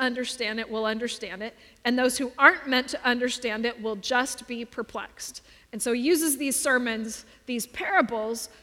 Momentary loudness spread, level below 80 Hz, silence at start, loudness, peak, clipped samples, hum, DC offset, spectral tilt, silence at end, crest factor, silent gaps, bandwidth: 13 LU; -62 dBFS; 0 s; -26 LUFS; -2 dBFS; under 0.1%; none; under 0.1%; -2 dB/octave; 0.15 s; 24 dB; none; 17.5 kHz